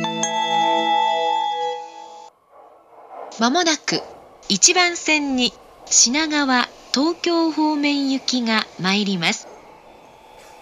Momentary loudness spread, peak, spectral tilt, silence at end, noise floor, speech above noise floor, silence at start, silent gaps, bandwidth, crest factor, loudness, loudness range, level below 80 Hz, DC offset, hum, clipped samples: 12 LU; 0 dBFS; -2 dB/octave; 0.05 s; -49 dBFS; 30 dB; 0 s; none; 13 kHz; 20 dB; -18 LUFS; 6 LU; -62 dBFS; under 0.1%; none; under 0.1%